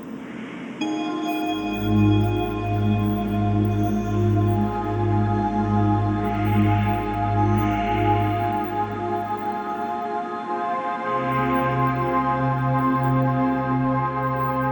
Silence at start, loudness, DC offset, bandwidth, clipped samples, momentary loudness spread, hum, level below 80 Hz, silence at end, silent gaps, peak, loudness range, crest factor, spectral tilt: 0 s; -23 LUFS; under 0.1%; 19.5 kHz; under 0.1%; 6 LU; none; -40 dBFS; 0 s; none; -8 dBFS; 3 LU; 14 dB; -8.5 dB/octave